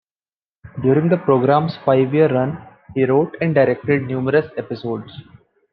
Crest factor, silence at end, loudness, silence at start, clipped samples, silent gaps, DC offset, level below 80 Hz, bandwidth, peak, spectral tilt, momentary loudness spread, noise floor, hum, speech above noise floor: 16 dB; 0.5 s; -18 LUFS; 0.65 s; under 0.1%; none; under 0.1%; -58 dBFS; 5.4 kHz; -2 dBFS; -11 dB/octave; 13 LU; under -90 dBFS; none; over 73 dB